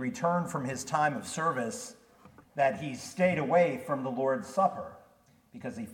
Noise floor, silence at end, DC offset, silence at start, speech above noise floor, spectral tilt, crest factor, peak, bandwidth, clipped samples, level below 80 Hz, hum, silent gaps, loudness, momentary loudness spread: -63 dBFS; 0 s; under 0.1%; 0 s; 33 dB; -5.5 dB/octave; 18 dB; -12 dBFS; 17 kHz; under 0.1%; -72 dBFS; none; none; -30 LUFS; 16 LU